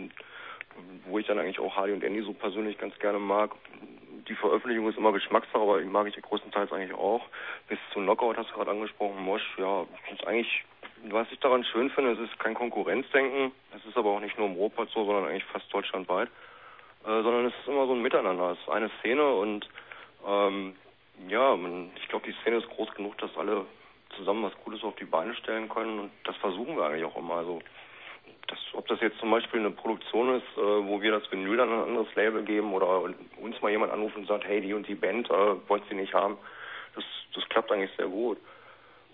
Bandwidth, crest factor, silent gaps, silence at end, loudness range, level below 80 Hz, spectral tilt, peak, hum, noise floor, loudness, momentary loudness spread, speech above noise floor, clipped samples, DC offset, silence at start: 4.1 kHz; 22 dB; none; 0.4 s; 5 LU; -76 dBFS; -8 dB/octave; -8 dBFS; none; -55 dBFS; -30 LUFS; 15 LU; 25 dB; under 0.1%; under 0.1%; 0 s